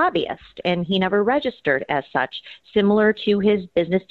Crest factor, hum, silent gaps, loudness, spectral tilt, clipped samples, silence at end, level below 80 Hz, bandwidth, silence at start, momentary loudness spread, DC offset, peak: 14 dB; none; none; -21 LUFS; -8 dB/octave; under 0.1%; 0.1 s; -54 dBFS; 4.9 kHz; 0 s; 8 LU; under 0.1%; -6 dBFS